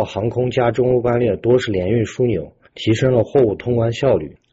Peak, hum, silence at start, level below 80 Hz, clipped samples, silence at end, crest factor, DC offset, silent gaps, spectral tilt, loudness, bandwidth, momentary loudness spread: -4 dBFS; none; 0 s; -46 dBFS; under 0.1%; 0.2 s; 12 dB; under 0.1%; none; -7.5 dB/octave; -18 LUFS; 8 kHz; 5 LU